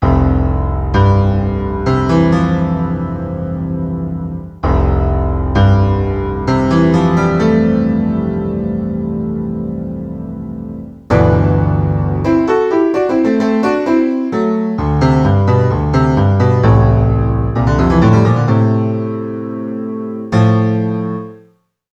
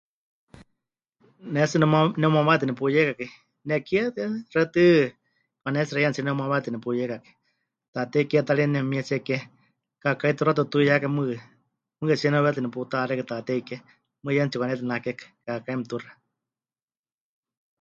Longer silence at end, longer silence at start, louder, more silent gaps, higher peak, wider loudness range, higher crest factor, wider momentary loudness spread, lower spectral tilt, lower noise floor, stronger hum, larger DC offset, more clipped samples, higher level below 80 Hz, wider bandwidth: second, 0.55 s vs 1.7 s; second, 0 s vs 1.45 s; first, -14 LUFS vs -24 LUFS; second, none vs 7.88-7.93 s; first, 0 dBFS vs -4 dBFS; about the same, 5 LU vs 7 LU; second, 14 dB vs 22 dB; second, 11 LU vs 14 LU; first, -9 dB/octave vs -7 dB/octave; second, -51 dBFS vs under -90 dBFS; neither; neither; neither; first, -24 dBFS vs -66 dBFS; about the same, 7.8 kHz vs 7.6 kHz